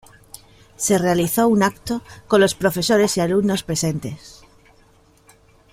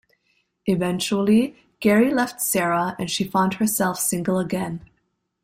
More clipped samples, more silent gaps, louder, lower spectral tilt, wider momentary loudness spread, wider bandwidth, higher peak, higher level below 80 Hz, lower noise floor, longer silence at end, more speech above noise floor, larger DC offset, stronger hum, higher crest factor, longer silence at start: neither; neither; first, -19 LUFS vs -22 LUFS; about the same, -4.5 dB/octave vs -4.5 dB/octave; about the same, 11 LU vs 9 LU; about the same, 16 kHz vs 16 kHz; first, 0 dBFS vs -6 dBFS; first, -50 dBFS vs -58 dBFS; second, -54 dBFS vs -72 dBFS; first, 1.4 s vs 0.65 s; second, 35 dB vs 51 dB; neither; neither; about the same, 20 dB vs 16 dB; first, 0.8 s vs 0.65 s